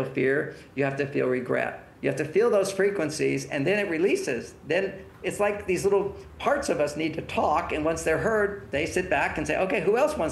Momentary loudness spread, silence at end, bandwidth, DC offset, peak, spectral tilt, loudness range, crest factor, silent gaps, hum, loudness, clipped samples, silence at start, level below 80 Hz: 7 LU; 0 s; 12.5 kHz; under 0.1%; -10 dBFS; -5 dB/octave; 1 LU; 16 dB; none; none; -26 LUFS; under 0.1%; 0 s; -52 dBFS